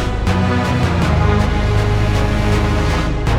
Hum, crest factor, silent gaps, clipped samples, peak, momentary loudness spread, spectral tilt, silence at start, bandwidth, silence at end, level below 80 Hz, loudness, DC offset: none; 12 dB; none; under 0.1%; -2 dBFS; 2 LU; -6.5 dB/octave; 0 s; 13.5 kHz; 0 s; -20 dBFS; -16 LUFS; 0.5%